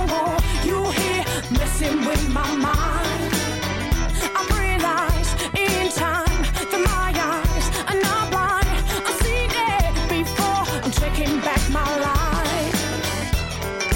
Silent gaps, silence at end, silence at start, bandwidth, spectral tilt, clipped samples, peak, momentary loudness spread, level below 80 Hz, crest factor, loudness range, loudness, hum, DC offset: none; 0 s; 0 s; 17 kHz; -4 dB/octave; under 0.1%; -10 dBFS; 3 LU; -26 dBFS; 12 dB; 1 LU; -21 LUFS; none; under 0.1%